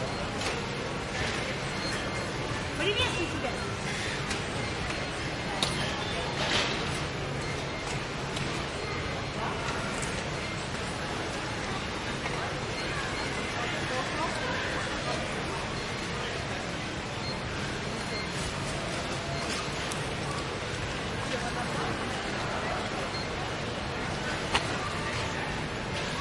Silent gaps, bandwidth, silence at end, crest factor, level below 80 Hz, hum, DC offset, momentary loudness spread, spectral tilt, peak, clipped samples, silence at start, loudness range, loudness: none; 11.5 kHz; 0 s; 22 dB; -46 dBFS; none; under 0.1%; 4 LU; -4 dB/octave; -10 dBFS; under 0.1%; 0 s; 2 LU; -32 LUFS